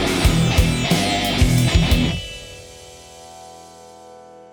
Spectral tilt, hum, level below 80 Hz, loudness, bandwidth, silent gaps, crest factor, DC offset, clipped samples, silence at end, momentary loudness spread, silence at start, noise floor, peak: -5 dB/octave; none; -26 dBFS; -18 LUFS; over 20 kHz; none; 18 dB; under 0.1%; under 0.1%; 0.15 s; 23 LU; 0 s; -42 dBFS; -2 dBFS